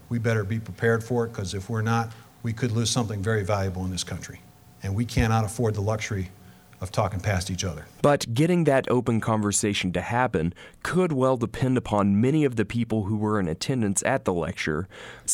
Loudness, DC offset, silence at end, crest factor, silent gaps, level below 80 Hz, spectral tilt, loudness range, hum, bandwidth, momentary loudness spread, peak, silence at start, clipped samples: -25 LUFS; under 0.1%; 0 s; 18 dB; none; -46 dBFS; -5.5 dB/octave; 4 LU; none; 16 kHz; 10 LU; -8 dBFS; 0.1 s; under 0.1%